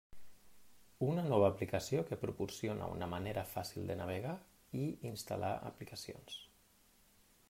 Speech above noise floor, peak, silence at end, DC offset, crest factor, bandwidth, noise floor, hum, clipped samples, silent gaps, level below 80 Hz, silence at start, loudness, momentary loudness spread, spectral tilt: 30 dB; -18 dBFS; 1.05 s; under 0.1%; 22 dB; 16 kHz; -69 dBFS; none; under 0.1%; none; -66 dBFS; 0.1 s; -40 LUFS; 15 LU; -6 dB/octave